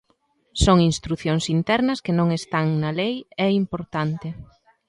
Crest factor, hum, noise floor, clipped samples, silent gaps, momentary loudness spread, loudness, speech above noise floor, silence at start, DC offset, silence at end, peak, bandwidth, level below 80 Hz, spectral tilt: 20 dB; none; -66 dBFS; under 0.1%; none; 9 LU; -22 LUFS; 44 dB; 0.55 s; under 0.1%; 0.45 s; -4 dBFS; 11.5 kHz; -38 dBFS; -6 dB/octave